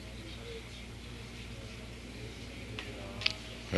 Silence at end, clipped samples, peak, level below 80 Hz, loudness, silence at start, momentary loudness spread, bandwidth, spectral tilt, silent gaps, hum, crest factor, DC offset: 0 s; under 0.1%; -6 dBFS; -50 dBFS; -41 LUFS; 0 s; 12 LU; 12 kHz; -4 dB/octave; none; none; 34 dB; under 0.1%